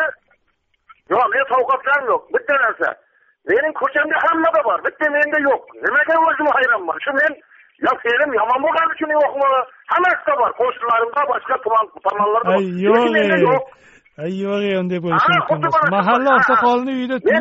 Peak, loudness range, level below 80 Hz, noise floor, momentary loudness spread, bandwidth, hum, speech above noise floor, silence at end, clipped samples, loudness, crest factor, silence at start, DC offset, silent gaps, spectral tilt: -2 dBFS; 2 LU; -62 dBFS; -66 dBFS; 6 LU; 7.8 kHz; none; 49 dB; 0 s; under 0.1%; -17 LUFS; 16 dB; 0 s; under 0.1%; none; -3 dB/octave